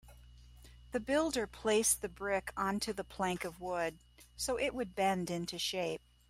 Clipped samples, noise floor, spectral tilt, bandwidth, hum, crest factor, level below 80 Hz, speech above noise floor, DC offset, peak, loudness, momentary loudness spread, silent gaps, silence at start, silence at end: under 0.1%; -57 dBFS; -3 dB/octave; 16 kHz; 60 Hz at -60 dBFS; 18 dB; -58 dBFS; 21 dB; under 0.1%; -18 dBFS; -35 LUFS; 9 LU; none; 0.05 s; 0.3 s